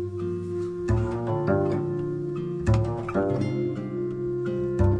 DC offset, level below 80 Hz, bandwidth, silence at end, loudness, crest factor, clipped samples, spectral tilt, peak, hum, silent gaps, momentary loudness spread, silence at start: under 0.1%; -40 dBFS; 9.6 kHz; 0 s; -27 LUFS; 16 dB; under 0.1%; -9 dB/octave; -10 dBFS; none; none; 6 LU; 0 s